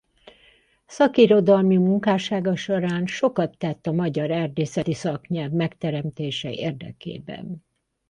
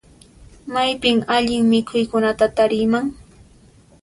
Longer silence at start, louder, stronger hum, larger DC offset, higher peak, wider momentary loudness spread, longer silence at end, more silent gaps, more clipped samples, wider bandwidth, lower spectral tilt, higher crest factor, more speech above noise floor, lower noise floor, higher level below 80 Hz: first, 0.9 s vs 0.4 s; second, -22 LUFS vs -18 LUFS; neither; neither; about the same, -2 dBFS vs -4 dBFS; first, 18 LU vs 7 LU; second, 0.5 s vs 0.9 s; neither; neither; second, 9.8 kHz vs 11.5 kHz; first, -7 dB/octave vs -5 dB/octave; about the same, 20 dB vs 16 dB; first, 36 dB vs 32 dB; first, -58 dBFS vs -50 dBFS; second, -60 dBFS vs -48 dBFS